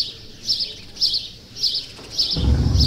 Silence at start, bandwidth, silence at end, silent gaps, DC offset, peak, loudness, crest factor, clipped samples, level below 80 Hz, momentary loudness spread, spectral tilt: 0 s; 15.5 kHz; 0 s; none; under 0.1%; -6 dBFS; -21 LUFS; 16 dB; under 0.1%; -28 dBFS; 8 LU; -4.5 dB/octave